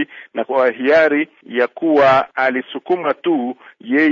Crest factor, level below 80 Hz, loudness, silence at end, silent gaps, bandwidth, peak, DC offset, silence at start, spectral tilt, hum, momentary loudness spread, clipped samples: 12 dB; -60 dBFS; -16 LUFS; 0 s; none; 7.2 kHz; -4 dBFS; under 0.1%; 0 s; -6.5 dB/octave; none; 11 LU; under 0.1%